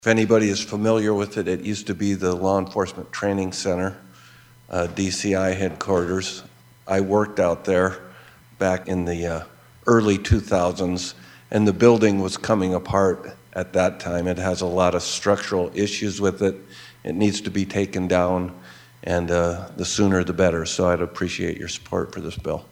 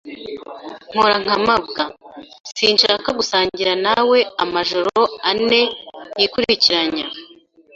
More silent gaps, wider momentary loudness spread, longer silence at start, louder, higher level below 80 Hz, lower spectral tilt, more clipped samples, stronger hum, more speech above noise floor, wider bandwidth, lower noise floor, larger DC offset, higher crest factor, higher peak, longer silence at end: second, none vs 2.40-2.44 s; second, 10 LU vs 18 LU; about the same, 0.05 s vs 0.05 s; second, -22 LUFS vs -16 LUFS; first, -46 dBFS vs -54 dBFS; first, -5.5 dB/octave vs -3 dB/octave; neither; neither; about the same, 28 dB vs 30 dB; first, 16.5 kHz vs 7.8 kHz; about the same, -49 dBFS vs -48 dBFS; neither; about the same, 22 dB vs 18 dB; about the same, -2 dBFS vs 0 dBFS; second, 0.05 s vs 0.5 s